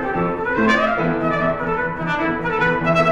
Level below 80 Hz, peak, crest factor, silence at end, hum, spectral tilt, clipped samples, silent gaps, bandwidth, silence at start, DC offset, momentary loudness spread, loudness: -40 dBFS; -4 dBFS; 16 dB; 0 s; none; -6.5 dB/octave; under 0.1%; none; 9.8 kHz; 0 s; under 0.1%; 5 LU; -19 LUFS